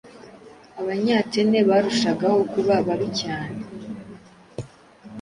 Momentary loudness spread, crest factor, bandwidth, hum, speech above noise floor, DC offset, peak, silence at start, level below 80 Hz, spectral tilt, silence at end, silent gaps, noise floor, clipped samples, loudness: 20 LU; 16 dB; 11 kHz; none; 25 dB; under 0.1%; -6 dBFS; 0.05 s; -58 dBFS; -5.5 dB/octave; 0 s; none; -46 dBFS; under 0.1%; -21 LUFS